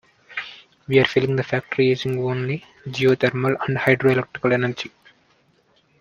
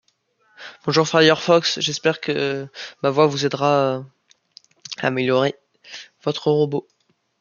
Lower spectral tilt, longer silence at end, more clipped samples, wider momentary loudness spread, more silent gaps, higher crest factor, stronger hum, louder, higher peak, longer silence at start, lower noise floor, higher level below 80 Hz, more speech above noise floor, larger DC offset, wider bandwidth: first, -7 dB/octave vs -4.5 dB/octave; first, 1.1 s vs 0.6 s; neither; second, 14 LU vs 22 LU; neither; about the same, 20 dB vs 20 dB; neither; about the same, -21 LUFS vs -20 LUFS; about the same, -2 dBFS vs -2 dBFS; second, 0.3 s vs 0.6 s; about the same, -61 dBFS vs -64 dBFS; first, -60 dBFS vs -68 dBFS; second, 41 dB vs 45 dB; neither; first, 10.5 kHz vs 7.4 kHz